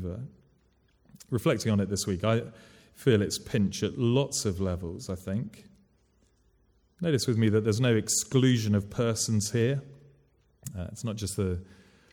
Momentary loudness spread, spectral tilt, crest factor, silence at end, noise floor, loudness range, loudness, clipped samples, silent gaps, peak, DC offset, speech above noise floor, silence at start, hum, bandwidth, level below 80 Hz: 14 LU; -5 dB/octave; 18 dB; 0.4 s; -67 dBFS; 6 LU; -28 LUFS; under 0.1%; none; -10 dBFS; under 0.1%; 39 dB; 0 s; none; 18 kHz; -56 dBFS